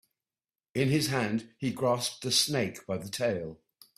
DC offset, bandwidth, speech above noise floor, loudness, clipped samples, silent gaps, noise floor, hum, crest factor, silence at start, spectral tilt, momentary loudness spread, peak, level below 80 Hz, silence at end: under 0.1%; 15.5 kHz; over 60 dB; -30 LUFS; under 0.1%; none; under -90 dBFS; none; 22 dB; 0.75 s; -4 dB/octave; 11 LU; -10 dBFS; -66 dBFS; 0.45 s